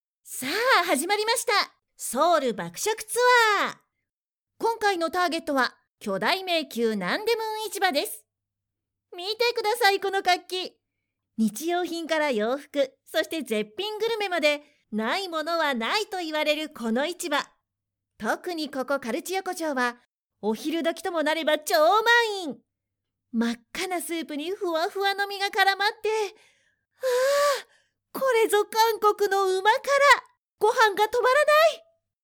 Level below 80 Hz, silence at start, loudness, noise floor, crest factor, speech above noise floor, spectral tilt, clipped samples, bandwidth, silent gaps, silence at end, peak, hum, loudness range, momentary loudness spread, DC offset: -72 dBFS; 0.25 s; -25 LUFS; -89 dBFS; 18 dB; 65 dB; -2.5 dB/octave; under 0.1%; over 20 kHz; 4.22-4.26 s, 5.91-5.95 s, 20.24-20.28 s; 0.45 s; -8 dBFS; none; 6 LU; 12 LU; under 0.1%